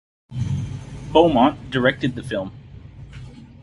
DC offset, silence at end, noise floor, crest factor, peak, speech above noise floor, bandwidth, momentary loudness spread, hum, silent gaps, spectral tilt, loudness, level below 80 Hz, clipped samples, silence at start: under 0.1%; 0.15 s; -40 dBFS; 20 dB; -2 dBFS; 22 dB; 11.5 kHz; 24 LU; none; none; -7 dB/octave; -20 LUFS; -42 dBFS; under 0.1%; 0.3 s